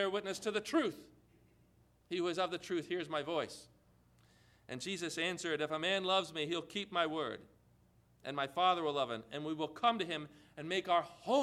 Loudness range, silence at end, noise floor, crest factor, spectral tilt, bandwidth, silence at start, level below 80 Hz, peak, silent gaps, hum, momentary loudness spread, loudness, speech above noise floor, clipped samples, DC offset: 5 LU; 0 s; -69 dBFS; 20 dB; -4 dB/octave; 14.5 kHz; 0 s; -76 dBFS; -18 dBFS; none; 60 Hz at -70 dBFS; 11 LU; -37 LUFS; 32 dB; under 0.1%; under 0.1%